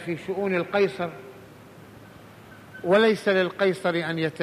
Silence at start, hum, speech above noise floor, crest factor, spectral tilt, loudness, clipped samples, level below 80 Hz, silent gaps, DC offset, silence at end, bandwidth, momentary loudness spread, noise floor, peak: 0 s; none; 23 dB; 18 dB; -6 dB/octave; -24 LUFS; under 0.1%; -66 dBFS; none; under 0.1%; 0 s; 15 kHz; 15 LU; -47 dBFS; -8 dBFS